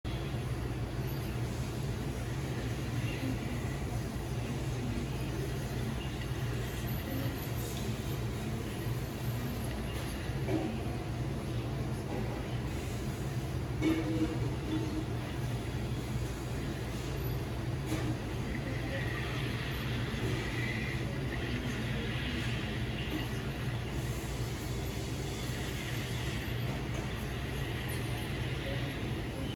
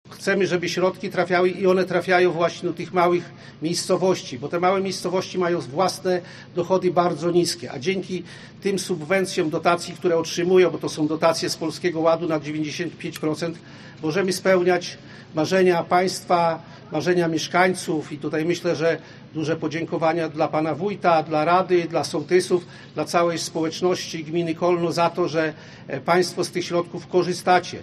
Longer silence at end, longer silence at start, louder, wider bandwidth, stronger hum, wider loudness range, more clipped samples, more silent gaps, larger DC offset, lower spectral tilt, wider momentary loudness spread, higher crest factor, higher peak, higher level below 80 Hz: about the same, 0 s vs 0 s; about the same, 0.05 s vs 0.05 s; second, -36 LUFS vs -22 LUFS; first, 19.5 kHz vs 13 kHz; neither; about the same, 2 LU vs 2 LU; neither; neither; neither; about the same, -6 dB/octave vs -5 dB/octave; second, 3 LU vs 10 LU; about the same, 18 dB vs 20 dB; second, -18 dBFS vs -2 dBFS; first, -44 dBFS vs -64 dBFS